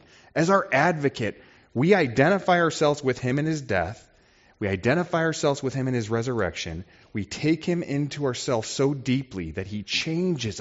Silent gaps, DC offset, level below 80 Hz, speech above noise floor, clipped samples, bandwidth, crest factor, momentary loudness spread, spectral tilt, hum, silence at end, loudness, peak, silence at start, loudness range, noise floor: none; under 0.1%; -56 dBFS; 34 dB; under 0.1%; 8 kHz; 20 dB; 12 LU; -5 dB/octave; none; 0 s; -25 LUFS; -4 dBFS; 0.35 s; 5 LU; -58 dBFS